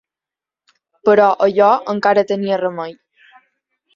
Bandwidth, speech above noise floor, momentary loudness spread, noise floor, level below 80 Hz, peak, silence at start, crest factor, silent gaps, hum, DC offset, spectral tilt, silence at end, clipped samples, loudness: 7.2 kHz; 74 dB; 10 LU; -88 dBFS; -64 dBFS; -2 dBFS; 1.05 s; 16 dB; none; none; under 0.1%; -6.5 dB/octave; 1.05 s; under 0.1%; -15 LUFS